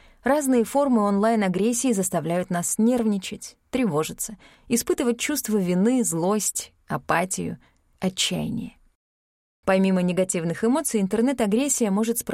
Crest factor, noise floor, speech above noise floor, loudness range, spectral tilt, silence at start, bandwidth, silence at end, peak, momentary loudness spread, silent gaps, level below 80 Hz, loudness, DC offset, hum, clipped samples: 16 dB; under -90 dBFS; over 67 dB; 4 LU; -4.5 dB/octave; 0.25 s; 16.5 kHz; 0 s; -8 dBFS; 10 LU; 8.95-9.63 s; -56 dBFS; -23 LUFS; under 0.1%; none; under 0.1%